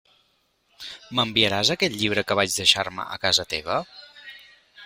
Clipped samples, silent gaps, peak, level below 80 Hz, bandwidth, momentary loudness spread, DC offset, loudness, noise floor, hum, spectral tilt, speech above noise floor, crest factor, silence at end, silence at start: under 0.1%; none; -2 dBFS; -58 dBFS; 16 kHz; 22 LU; under 0.1%; -22 LUFS; -67 dBFS; none; -2.5 dB/octave; 44 dB; 24 dB; 0 s; 0.8 s